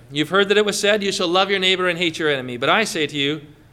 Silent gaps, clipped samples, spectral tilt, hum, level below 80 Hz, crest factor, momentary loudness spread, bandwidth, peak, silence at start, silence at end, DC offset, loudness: none; under 0.1%; -3 dB/octave; none; -58 dBFS; 16 dB; 5 LU; 15.5 kHz; -4 dBFS; 0.1 s; 0.2 s; under 0.1%; -18 LUFS